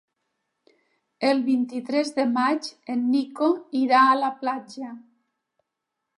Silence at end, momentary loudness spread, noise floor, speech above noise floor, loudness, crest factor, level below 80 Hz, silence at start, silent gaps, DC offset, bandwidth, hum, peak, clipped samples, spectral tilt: 1.2 s; 12 LU; -82 dBFS; 60 dB; -23 LUFS; 20 dB; -82 dBFS; 1.2 s; none; under 0.1%; 11 kHz; none; -6 dBFS; under 0.1%; -4 dB/octave